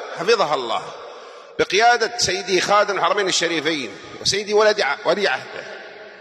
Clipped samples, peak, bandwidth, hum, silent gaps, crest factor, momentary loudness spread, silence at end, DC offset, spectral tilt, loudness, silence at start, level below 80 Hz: under 0.1%; -4 dBFS; 13 kHz; none; none; 16 dB; 18 LU; 0 s; under 0.1%; -2 dB/octave; -19 LUFS; 0 s; -58 dBFS